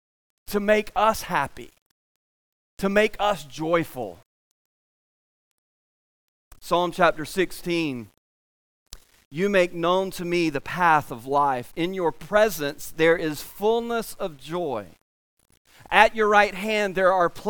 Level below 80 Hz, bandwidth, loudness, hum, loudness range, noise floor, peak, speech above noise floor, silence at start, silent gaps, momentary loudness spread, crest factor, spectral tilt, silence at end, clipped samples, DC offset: -52 dBFS; 19.5 kHz; -23 LUFS; none; 5 LU; under -90 dBFS; 0 dBFS; over 67 dB; 0.5 s; 1.82-2.77 s, 4.26-6.51 s, 8.18-8.86 s, 9.25-9.31 s, 15.01-15.37 s, 15.57-15.65 s; 11 LU; 24 dB; -4.5 dB/octave; 0 s; under 0.1%; under 0.1%